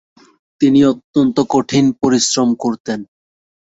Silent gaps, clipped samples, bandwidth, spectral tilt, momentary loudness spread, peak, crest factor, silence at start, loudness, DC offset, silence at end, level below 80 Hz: 1.04-1.14 s, 2.80-2.85 s; under 0.1%; 8 kHz; -4.5 dB/octave; 9 LU; -2 dBFS; 14 dB; 0.6 s; -15 LUFS; under 0.1%; 0.7 s; -52 dBFS